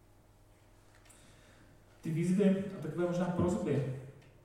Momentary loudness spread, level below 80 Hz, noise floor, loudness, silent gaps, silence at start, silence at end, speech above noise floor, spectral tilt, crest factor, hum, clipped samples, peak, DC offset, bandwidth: 14 LU; -64 dBFS; -62 dBFS; -33 LUFS; none; 2.05 s; 0.25 s; 30 dB; -8 dB/octave; 18 dB; none; under 0.1%; -18 dBFS; under 0.1%; 12 kHz